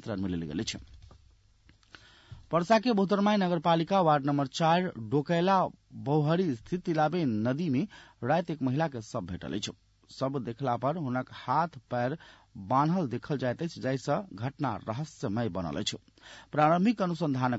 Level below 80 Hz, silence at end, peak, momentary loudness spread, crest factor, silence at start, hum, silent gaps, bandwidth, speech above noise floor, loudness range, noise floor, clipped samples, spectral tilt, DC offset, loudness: -62 dBFS; 0 s; -12 dBFS; 11 LU; 18 dB; 0.05 s; none; none; 8 kHz; 33 dB; 6 LU; -62 dBFS; under 0.1%; -6.5 dB/octave; under 0.1%; -30 LUFS